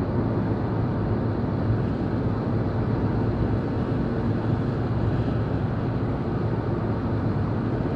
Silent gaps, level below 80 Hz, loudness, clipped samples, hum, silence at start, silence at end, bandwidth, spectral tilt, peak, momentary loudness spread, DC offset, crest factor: none; -38 dBFS; -26 LUFS; under 0.1%; none; 0 s; 0 s; 5.4 kHz; -10.5 dB/octave; -12 dBFS; 2 LU; under 0.1%; 14 dB